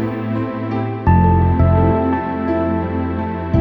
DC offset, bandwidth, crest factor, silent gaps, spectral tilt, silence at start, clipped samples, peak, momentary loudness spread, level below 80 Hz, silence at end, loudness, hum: under 0.1%; 4.6 kHz; 14 dB; none; -11 dB/octave; 0 s; under 0.1%; -2 dBFS; 8 LU; -28 dBFS; 0 s; -17 LUFS; none